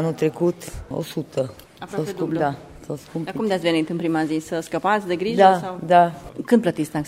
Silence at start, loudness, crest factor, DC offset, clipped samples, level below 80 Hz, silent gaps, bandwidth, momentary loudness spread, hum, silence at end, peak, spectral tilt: 0 s; -22 LUFS; 20 dB; under 0.1%; under 0.1%; -50 dBFS; none; 16 kHz; 15 LU; none; 0 s; -2 dBFS; -6 dB/octave